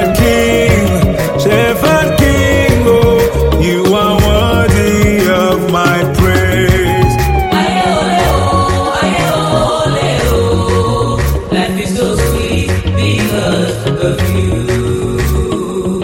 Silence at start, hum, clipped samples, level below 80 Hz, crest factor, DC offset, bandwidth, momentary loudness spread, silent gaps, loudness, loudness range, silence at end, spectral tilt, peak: 0 s; none; under 0.1%; -22 dBFS; 10 dB; under 0.1%; 17 kHz; 5 LU; none; -11 LUFS; 4 LU; 0 s; -5.5 dB/octave; 0 dBFS